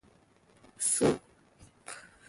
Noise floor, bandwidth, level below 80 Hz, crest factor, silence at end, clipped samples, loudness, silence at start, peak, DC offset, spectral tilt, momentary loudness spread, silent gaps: -64 dBFS; 12 kHz; -64 dBFS; 20 dB; 0.25 s; under 0.1%; -29 LUFS; 0.8 s; -14 dBFS; under 0.1%; -3.5 dB/octave; 20 LU; none